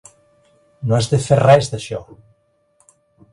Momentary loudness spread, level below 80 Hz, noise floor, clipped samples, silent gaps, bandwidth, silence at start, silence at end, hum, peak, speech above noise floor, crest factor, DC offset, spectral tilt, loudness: 17 LU; -50 dBFS; -61 dBFS; under 0.1%; none; 11.5 kHz; 0.8 s; 1.3 s; none; 0 dBFS; 45 dB; 18 dB; under 0.1%; -6 dB/octave; -16 LUFS